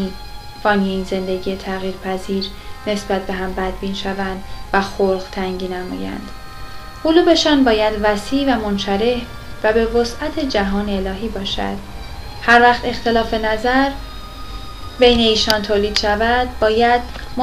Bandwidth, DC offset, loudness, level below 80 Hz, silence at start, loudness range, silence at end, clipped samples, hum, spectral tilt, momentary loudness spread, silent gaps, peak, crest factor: 15.5 kHz; under 0.1%; -17 LUFS; -34 dBFS; 0 s; 6 LU; 0 s; under 0.1%; none; -4.5 dB/octave; 19 LU; none; 0 dBFS; 18 dB